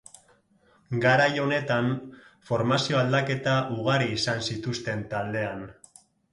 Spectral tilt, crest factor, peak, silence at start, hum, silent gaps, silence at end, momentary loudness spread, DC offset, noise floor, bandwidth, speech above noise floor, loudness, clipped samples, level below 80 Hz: -5.5 dB/octave; 18 dB; -8 dBFS; 0.9 s; none; none; 0.6 s; 11 LU; under 0.1%; -63 dBFS; 11.5 kHz; 37 dB; -26 LUFS; under 0.1%; -60 dBFS